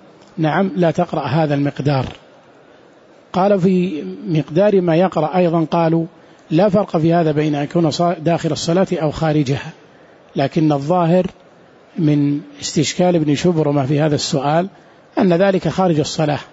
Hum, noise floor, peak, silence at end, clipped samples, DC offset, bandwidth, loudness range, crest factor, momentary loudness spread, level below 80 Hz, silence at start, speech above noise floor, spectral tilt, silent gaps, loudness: none; -47 dBFS; -4 dBFS; 0.05 s; under 0.1%; under 0.1%; 8 kHz; 3 LU; 14 dB; 7 LU; -50 dBFS; 0.35 s; 31 dB; -6.5 dB/octave; none; -17 LUFS